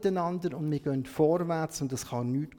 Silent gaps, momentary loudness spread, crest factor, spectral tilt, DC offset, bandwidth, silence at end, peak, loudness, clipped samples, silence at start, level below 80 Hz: none; 7 LU; 16 dB; -6.5 dB/octave; under 0.1%; 19 kHz; 0 s; -14 dBFS; -30 LUFS; under 0.1%; 0 s; -62 dBFS